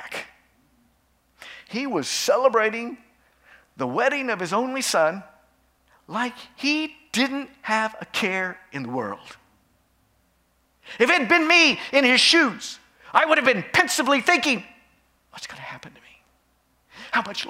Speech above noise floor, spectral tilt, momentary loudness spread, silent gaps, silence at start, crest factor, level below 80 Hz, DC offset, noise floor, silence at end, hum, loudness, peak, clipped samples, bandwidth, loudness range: 43 dB; -2.5 dB/octave; 20 LU; none; 0 s; 24 dB; -68 dBFS; under 0.1%; -65 dBFS; 0 s; none; -21 LUFS; 0 dBFS; under 0.1%; 16 kHz; 9 LU